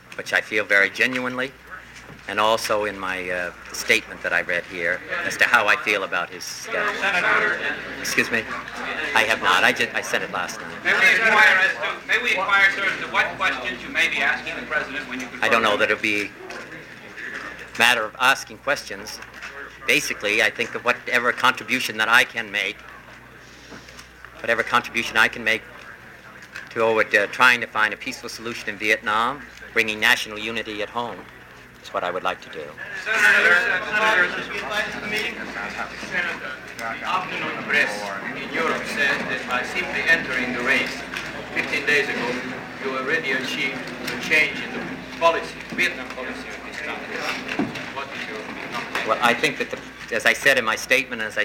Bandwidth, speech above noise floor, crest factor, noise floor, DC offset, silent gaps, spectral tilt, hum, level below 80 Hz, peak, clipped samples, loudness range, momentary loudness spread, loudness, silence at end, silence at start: 17 kHz; 22 dB; 22 dB; -44 dBFS; under 0.1%; none; -2.5 dB/octave; none; -56 dBFS; 0 dBFS; under 0.1%; 7 LU; 15 LU; -21 LUFS; 0 s; 0.05 s